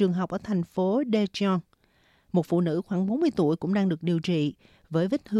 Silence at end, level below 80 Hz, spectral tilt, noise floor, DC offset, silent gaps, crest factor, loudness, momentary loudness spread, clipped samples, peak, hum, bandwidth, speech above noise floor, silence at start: 0 s; -64 dBFS; -8 dB/octave; -64 dBFS; under 0.1%; none; 14 dB; -27 LUFS; 5 LU; under 0.1%; -12 dBFS; none; 10.5 kHz; 39 dB; 0 s